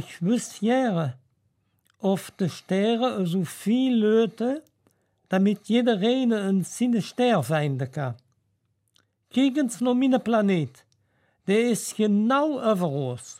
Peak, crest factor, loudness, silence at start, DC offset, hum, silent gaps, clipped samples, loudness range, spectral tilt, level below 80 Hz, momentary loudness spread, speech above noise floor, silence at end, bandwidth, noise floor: -10 dBFS; 14 dB; -24 LUFS; 0 s; under 0.1%; none; none; under 0.1%; 3 LU; -6 dB/octave; -76 dBFS; 8 LU; 49 dB; 0.05 s; 15.5 kHz; -72 dBFS